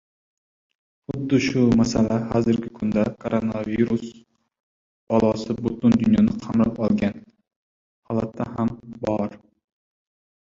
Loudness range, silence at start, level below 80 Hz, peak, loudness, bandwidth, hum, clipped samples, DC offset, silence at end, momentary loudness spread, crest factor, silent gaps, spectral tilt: 5 LU; 1.1 s; -48 dBFS; -6 dBFS; -22 LUFS; 7.6 kHz; none; under 0.1%; under 0.1%; 1.1 s; 10 LU; 18 dB; 4.60-5.07 s, 7.56-8.03 s; -7 dB/octave